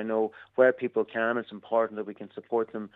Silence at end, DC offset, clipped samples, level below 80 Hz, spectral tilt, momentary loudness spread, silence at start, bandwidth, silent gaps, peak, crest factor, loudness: 0.1 s; under 0.1%; under 0.1%; -80 dBFS; -8 dB/octave; 12 LU; 0 s; 4.1 kHz; none; -8 dBFS; 20 dB; -28 LUFS